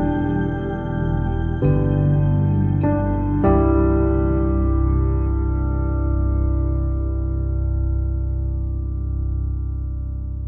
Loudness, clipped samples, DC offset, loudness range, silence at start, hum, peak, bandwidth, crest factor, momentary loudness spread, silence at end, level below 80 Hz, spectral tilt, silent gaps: -21 LUFS; under 0.1%; under 0.1%; 5 LU; 0 s; none; -4 dBFS; 3.3 kHz; 14 dB; 8 LU; 0 s; -22 dBFS; -12.5 dB/octave; none